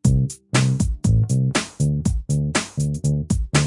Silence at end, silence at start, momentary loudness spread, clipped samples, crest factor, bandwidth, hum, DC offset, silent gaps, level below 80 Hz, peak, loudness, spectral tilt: 0 s; 0.05 s; 4 LU; under 0.1%; 16 dB; 11.5 kHz; none; under 0.1%; none; -30 dBFS; -4 dBFS; -21 LUFS; -5.5 dB/octave